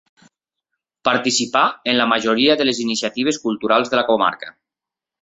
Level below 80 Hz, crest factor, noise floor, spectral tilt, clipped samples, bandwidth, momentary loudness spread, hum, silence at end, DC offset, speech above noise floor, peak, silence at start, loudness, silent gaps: -62 dBFS; 18 dB; -87 dBFS; -2.5 dB/octave; under 0.1%; 8.4 kHz; 6 LU; none; 0.7 s; under 0.1%; 69 dB; -2 dBFS; 1.05 s; -18 LUFS; none